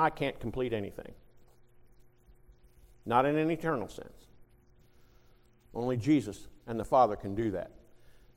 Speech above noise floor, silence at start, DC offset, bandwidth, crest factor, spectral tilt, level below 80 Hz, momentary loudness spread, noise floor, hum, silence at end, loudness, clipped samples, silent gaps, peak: 31 dB; 0 s; under 0.1%; 15.5 kHz; 22 dB; -7 dB/octave; -56 dBFS; 21 LU; -61 dBFS; none; 0.25 s; -31 LUFS; under 0.1%; none; -12 dBFS